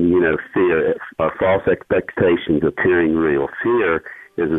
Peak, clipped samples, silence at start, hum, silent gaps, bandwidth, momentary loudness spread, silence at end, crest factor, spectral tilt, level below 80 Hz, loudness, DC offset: -4 dBFS; under 0.1%; 0 s; none; none; 3.9 kHz; 6 LU; 0 s; 14 dB; -9 dB/octave; -46 dBFS; -18 LUFS; under 0.1%